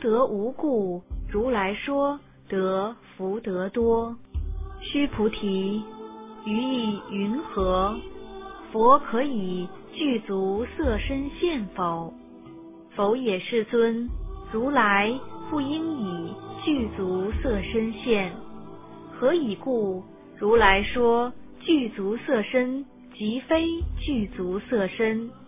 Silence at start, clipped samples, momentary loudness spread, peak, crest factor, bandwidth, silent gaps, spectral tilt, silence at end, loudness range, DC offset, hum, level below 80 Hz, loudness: 0 s; under 0.1%; 15 LU; -4 dBFS; 22 dB; 3.8 kHz; none; -10 dB/octave; 0 s; 5 LU; under 0.1%; none; -40 dBFS; -26 LUFS